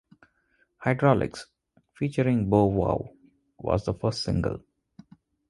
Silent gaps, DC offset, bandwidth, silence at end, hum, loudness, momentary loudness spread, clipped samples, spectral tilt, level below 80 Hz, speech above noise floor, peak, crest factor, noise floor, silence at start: none; under 0.1%; 11.5 kHz; 0.9 s; none; -26 LUFS; 13 LU; under 0.1%; -7.5 dB/octave; -46 dBFS; 44 dB; -6 dBFS; 22 dB; -69 dBFS; 0.8 s